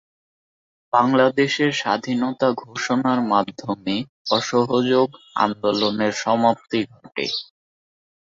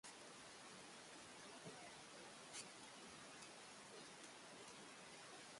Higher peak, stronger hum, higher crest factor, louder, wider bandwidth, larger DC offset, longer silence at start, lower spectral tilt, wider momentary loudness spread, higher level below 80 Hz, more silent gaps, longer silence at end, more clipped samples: first, -2 dBFS vs -40 dBFS; neither; about the same, 20 dB vs 18 dB; first, -21 LUFS vs -58 LUFS; second, 7.8 kHz vs 11.5 kHz; neither; first, 0.95 s vs 0.05 s; first, -5 dB/octave vs -2 dB/octave; first, 8 LU vs 3 LU; first, -64 dBFS vs -88 dBFS; first, 4.09-4.25 s vs none; first, 0.85 s vs 0 s; neither